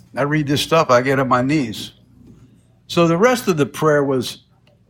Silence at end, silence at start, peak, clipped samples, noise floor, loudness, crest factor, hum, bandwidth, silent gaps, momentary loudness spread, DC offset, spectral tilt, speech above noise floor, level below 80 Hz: 0.55 s; 0.15 s; -2 dBFS; under 0.1%; -50 dBFS; -17 LUFS; 16 dB; none; 17.5 kHz; none; 13 LU; under 0.1%; -5.5 dB/octave; 33 dB; -52 dBFS